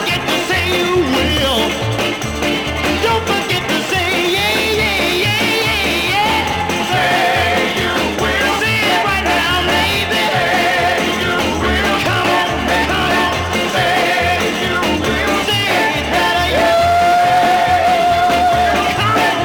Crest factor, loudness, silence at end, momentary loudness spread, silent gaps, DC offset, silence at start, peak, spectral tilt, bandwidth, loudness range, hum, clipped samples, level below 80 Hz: 12 dB; -14 LUFS; 0 s; 3 LU; none; under 0.1%; 0 s; -4 dBFS; -3.5 dB/octave; over 20 kHz; 3 LU; none; under 0.1%; -34 dBFS